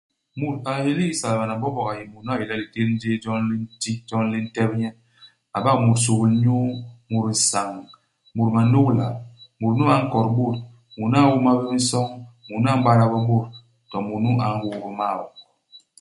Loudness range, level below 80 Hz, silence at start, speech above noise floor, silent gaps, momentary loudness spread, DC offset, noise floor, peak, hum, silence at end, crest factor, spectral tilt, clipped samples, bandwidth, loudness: 5 LU; -58 dBFS; 0.35 s; 32 dB; none; 14 LU; under 0.1%; -53 dBFS; -2 dBFS; none; 0.25 s; 20 dB; -5.5 dB/octave; under 0.1%; 11.5 kHz; -22 LUFS